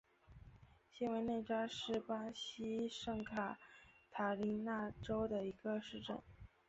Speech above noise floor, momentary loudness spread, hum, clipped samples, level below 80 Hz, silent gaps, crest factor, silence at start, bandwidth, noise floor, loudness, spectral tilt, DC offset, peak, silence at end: 22 dB; 21 LU; none; under 0.1%; -68 dBFS; none; 18 dB; 0.3 s; 8 kHz; -64 dBFS; -43 LUFS; -4 dB/octave; under 0.1%; -26 dBFS; 0.2 s